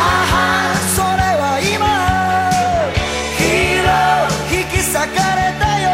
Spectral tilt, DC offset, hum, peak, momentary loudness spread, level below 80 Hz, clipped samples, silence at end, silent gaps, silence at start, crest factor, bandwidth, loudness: -3.5 dB/octave; under 0.1%; none; -2 dBFS; 3 LU; -30 dBFS; under 0.1%; 0 s; none; 0 s; 12 dB; 16 kHz; -15 LUFS